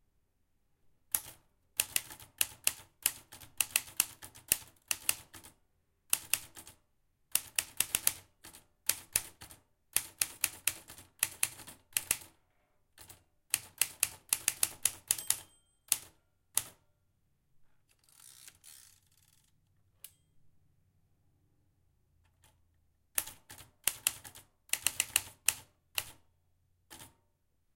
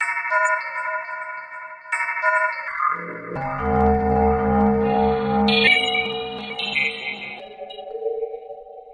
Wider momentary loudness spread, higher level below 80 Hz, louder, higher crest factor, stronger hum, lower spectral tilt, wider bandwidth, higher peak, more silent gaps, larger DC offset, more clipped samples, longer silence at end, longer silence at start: first, 22 LU vs 16 LU; second, -68 dBFS vs -40 dBFS; second, -34 LUFS vs -21 LUFS; first, 34 dB vs 18 dB; neither; second, 1.5 dB/octave vs -5 dB/octave; first, 17 kHz vs 10 kHz; about the same, -4 dBFS vs -4 dBFS; neither; neither; neither; first, 0.7 s vs 0 s; first, 1.15 s vs 0 s